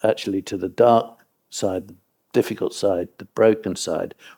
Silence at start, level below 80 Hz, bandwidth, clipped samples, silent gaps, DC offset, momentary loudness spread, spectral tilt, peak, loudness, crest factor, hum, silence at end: 0.05 s; -62 dBFS; 19.5 kHz; under 0.1%; none; under 0.1%; 13 LU; -5 dB/octave; -2 dBFS; -22 LUFS; 20 dB; none; 0.1 s